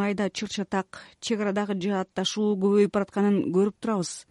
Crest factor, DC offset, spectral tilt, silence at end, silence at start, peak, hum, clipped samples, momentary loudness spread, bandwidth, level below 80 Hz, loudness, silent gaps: 14 dB; under 0.1%; -5.5 dB/octave; 0.1 s; 0 s; -10 dBFS; none; under 0.1%; 8 LU; 11.5 kHz; -66 dBFS; -26 LUFS; none